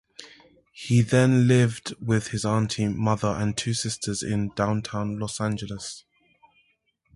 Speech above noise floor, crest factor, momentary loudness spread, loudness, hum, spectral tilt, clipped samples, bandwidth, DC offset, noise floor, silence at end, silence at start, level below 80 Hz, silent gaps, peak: 46 dB; 18 dB; 15 LU; -25 LUFS; none; -5.5 dB/octave; under 0.1%; 11.5 kHz; under 0.1%; -69 dBFS; 1.15 s; 0.2 s; -52 dBFS; none; -8 dBFS